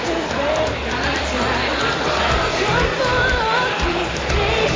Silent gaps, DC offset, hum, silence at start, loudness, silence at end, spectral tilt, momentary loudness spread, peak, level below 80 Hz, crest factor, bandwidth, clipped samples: none; under 0.1%; none; 0 s; -19 LUFS; 0 s; -4 dB/octave; 4 LU; -4 dBFS; -30 dBFS; 14 dB; 7.6 kHz; under 0.1%